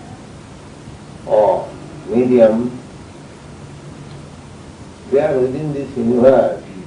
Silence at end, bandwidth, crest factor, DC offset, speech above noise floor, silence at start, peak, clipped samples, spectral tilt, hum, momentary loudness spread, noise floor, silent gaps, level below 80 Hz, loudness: 0 s; 10.5 kHz; 18 dB; under 0.1%; 23 dB; 0 s; 0 dBFS; under 0.1%; -7.5 dB/octave; none; 25 LU; -36 dBFS; none; -48 dBFS; -15 LUFS